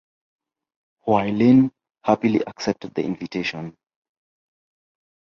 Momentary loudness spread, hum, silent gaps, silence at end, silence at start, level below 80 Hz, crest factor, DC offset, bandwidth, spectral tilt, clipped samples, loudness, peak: 13 LU; none; none; 1.7 s; 1.05 s; -60 dBFS; 20 dB; under 0.1%; 7 kHz; -7 dB/octave; under 0.1%; -21 LUFS; -2 dBFS